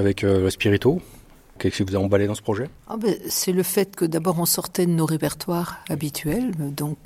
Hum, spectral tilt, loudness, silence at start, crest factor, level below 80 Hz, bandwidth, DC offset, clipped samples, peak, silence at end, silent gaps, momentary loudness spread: none; -5 dB/octave; -23 LUFS; 0 s; 18 dB; -50 dBFS; 16.5 kHz; under 0.1%; under 0.1%; -4 dBFS; 0.1 s; none; 7 LU